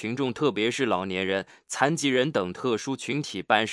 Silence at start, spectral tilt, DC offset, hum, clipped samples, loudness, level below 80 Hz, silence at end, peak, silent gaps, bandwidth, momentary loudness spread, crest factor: 0 s; -4 dB/octave; under 0.1%; none; under 0.1%; -26 LUFS; -72 dBFS; 0 s; -4 dBFS; none; 12 kHz; 6 LU; 22 dB